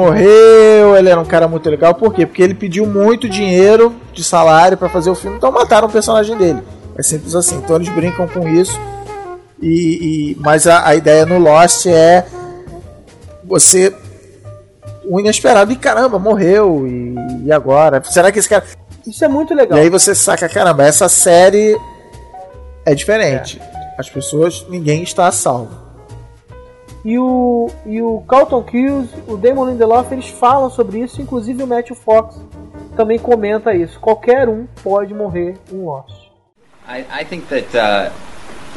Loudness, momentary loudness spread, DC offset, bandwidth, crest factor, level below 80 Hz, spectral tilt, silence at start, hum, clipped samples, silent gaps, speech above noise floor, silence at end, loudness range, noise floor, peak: -11 LUFS; 16 LU; under 0.1%; over 20 kHz; 12 dB; -40 dBFS; -4 dB/octave; 0 s; none; 0.2%; none; 40 dB; 0 s; 8 LU; -51 dBFS; 0 dBFS